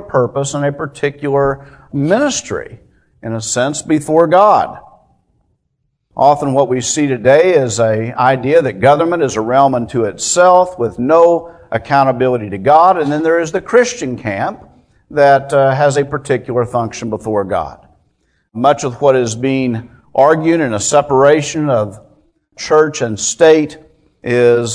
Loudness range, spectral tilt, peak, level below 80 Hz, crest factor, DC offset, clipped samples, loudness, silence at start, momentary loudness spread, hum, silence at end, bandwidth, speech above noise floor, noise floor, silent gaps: 5 LU; -5 dB/octave; 0 dBFS; -48 dBFS; 14 dB; under 0.1%; 0.2%; -13 LUFS; 0 s; 11 LU; none; 0 s; 11 kHz; 54 dB; -67 dBFS; none